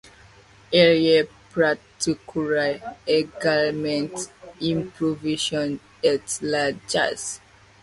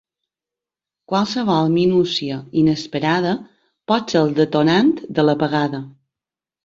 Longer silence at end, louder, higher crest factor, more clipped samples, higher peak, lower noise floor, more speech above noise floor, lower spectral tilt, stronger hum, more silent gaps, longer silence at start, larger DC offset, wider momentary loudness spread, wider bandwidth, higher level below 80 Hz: second, 0.45 s vs 0.75 s; second, -23 LUFS vs -18 LUFS; about the same, 20 dB vs 16 dB; neither; about the same, -4 dBFS vs -2 dBFS; second, -51 dBFS vs -89 dBFS; second, 28 dB vs 71 dB; second, -4 dB/octave vs -6.5 dB/octave; neither; neither; second, 0.7 s vs 1.1 s; neither; first, 12 LU vs 8 LU; first, 11.5 kHz vs 7.6 kHz; about the same, -58 dBFS vs -56 dBFS